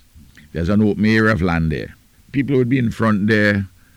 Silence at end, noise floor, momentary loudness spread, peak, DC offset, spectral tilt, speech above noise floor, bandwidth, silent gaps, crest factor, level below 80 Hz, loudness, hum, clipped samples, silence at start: 0.3 s; -45 dBFS; 10 LU; -6 dBFS; under 0.1%; -7.5 dB/octave; 29 dB; 11.5 kHz; none; 12 dB; -38 dBFS; -17 LUFS; none; under 0.1%; 0.55 s